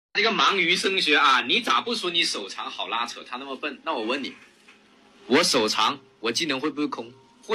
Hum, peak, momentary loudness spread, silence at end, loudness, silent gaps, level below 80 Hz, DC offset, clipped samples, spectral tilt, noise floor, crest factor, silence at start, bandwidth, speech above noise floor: none; -8 dBFS; 13 LU; 0 s; -23 LUFS; none; -74 dBFS; under 0.1%; under 0.1%; -2 dB/octave; -55 dBFS; 18 dB; 0.15 s; 15.5 kHz; 31 dB